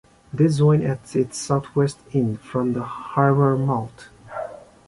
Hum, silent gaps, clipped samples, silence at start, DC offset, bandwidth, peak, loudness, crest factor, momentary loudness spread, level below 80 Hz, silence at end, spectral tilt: none; none; under 0.1%; 0.35 s; under 0.1%; 11.5 kHz; -4 dBFS; -21 LUFS; 18 dB; 16 LU; -54 dBFS; 0.3 s; -7.5 dB/octave